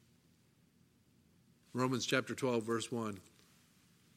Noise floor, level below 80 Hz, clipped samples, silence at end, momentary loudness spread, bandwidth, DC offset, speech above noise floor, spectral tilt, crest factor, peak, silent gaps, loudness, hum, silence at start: -70 dBFS; -82 dBFS; under 0.1%; 0.95 s; 11 LU; 16 kHz; under 0.1%; 34 dB; -4.5 dB/octave; 24 dB; -16 dBFS; none; -37 LUFS; none; 1.75 s